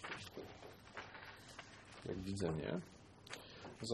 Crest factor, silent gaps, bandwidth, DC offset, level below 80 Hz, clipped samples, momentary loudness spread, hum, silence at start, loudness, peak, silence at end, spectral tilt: 22 dB; none; 13 kHz; under 0.1%; -66 dBFS; under 0.1%; 14 LU; none; 0 s; -48 LUFS; -26 dBFS; 0 s; -5 dB/octave